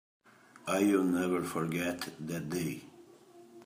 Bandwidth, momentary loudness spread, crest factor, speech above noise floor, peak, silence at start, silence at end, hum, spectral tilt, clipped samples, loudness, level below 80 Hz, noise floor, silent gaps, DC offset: 15.5 kHz; 12 LU; 18 dB; 25 dB; -16 dBFS; 0.65 s; 0 s; none; -5.5 dB/octave; under 0.1%; -33 LUFS; -74 dBFS; -57 dBFS; none; under 0.1%